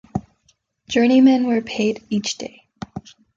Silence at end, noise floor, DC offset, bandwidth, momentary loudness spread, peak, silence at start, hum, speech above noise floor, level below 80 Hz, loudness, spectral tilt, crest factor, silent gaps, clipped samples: 0.35 s; -63 dBFS; under 0.1%; 7.6 kHz; 22 LU; -4 dBFS; 0.15 s; none; 46 dB; -54 dBFS; -18 LUFS; -5 dB/octave; 16 dB; none; under 0.1%